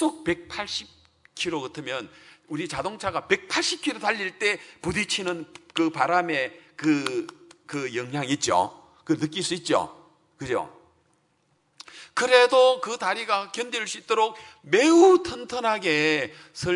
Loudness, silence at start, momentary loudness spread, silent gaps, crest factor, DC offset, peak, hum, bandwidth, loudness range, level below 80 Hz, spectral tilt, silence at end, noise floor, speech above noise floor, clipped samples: -24 LUFS; 0 s; 15 LU; none; 24 dB; under 0.1%; -2 dBFS; none; 11 kHz; 8 LU; -62 dBFS; -3.5 dB/octave; 0 s; -68 dBFS; 44 dB; under 0.1%